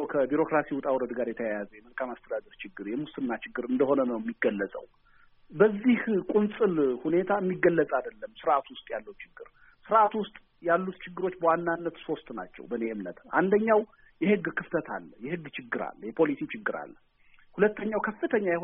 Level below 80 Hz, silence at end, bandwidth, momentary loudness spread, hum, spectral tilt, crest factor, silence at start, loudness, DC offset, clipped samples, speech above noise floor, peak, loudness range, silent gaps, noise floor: -64 dBFS; 0 s; 3.8 kHz; 14 LU; none; -5.5 dB/octave; 20 dB; 0 s; -29 LUFS; under 0.1%; under 0.1%; 30 dB; -8 dBFS; 5 LU; none; -58 dBFS